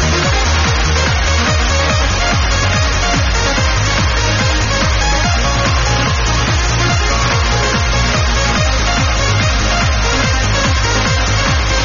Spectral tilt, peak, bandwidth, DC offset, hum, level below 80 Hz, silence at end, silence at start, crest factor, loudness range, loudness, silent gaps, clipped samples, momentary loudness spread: -3 dB/octave; -2 dBFS; 7.4 kHz; under 0.1%; none; -18 dBFS; 0 s; 0 s; 12 dB; 0 LU; -13 LUFS; none; under 0.1%; 1 LU